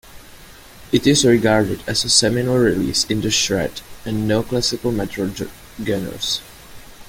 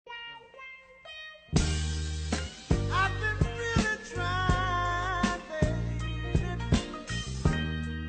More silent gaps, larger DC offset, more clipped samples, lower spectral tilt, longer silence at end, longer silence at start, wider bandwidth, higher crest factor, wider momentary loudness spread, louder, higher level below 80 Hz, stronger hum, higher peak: neither; neither; neither; about the same, -4 dB/octave vs -5 dB/octave; about the same, 0 s vs 0 s; about the same, 0.05 s vs 0.05 s; first, 17 kHz vs 9.2 kHz; about the same, 20 dB vs 20 dB; second, 12 LU vs 15 LU; first, -18 LUFS vs -30 LUFS; about the same, -42 dBFS vs -38 dBFS; neither; first, 0 dBFS vs -10 dBFS